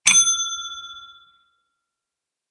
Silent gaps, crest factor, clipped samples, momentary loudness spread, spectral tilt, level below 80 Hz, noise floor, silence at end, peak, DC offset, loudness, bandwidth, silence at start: none; 24 dB; under 0.1%; 24 LU; 3.5 dB/octave; -64 dBFS; -85 dBFS; 1.4 s; 0 dBFS; under 0.1%; -17 LUFS; 11.5 kHz; 0.05 s